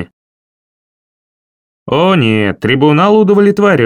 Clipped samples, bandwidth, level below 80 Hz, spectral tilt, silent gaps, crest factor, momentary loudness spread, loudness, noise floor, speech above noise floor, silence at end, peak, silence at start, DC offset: under 0.1%; 11 kHz; -50 dBFS; -7.5 dB/octave; 0.13-1.86 s; 12 dB; 5 LU; -10 LUFS; under -90 dBFS; over 81 dB; 0 s; 0 dBFS; 0 s; under 0.1%